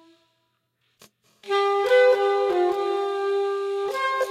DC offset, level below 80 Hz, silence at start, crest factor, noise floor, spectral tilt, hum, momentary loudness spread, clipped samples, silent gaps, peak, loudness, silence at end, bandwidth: under 0.1%; -74 dBFS; 1.45 s; 16 dB; -72 dBFS; -2.5 dB/octave; none; 9 LU; under 0.1%; none; -8 dBFS; -22 LUFS; 0 s; 14 kHz